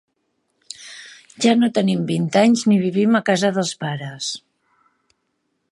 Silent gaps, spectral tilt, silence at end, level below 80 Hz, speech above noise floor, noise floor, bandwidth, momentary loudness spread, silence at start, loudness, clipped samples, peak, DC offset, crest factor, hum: none; -5 dB/octave; 1.35 s; -70 dBFS; 54 dB; -72 dBFS; 11.5 kHz; 20 LU; 0.8 s; -18 LUFS; under 0.1%; -2 dBFS; under 0.1%; 20 dB; none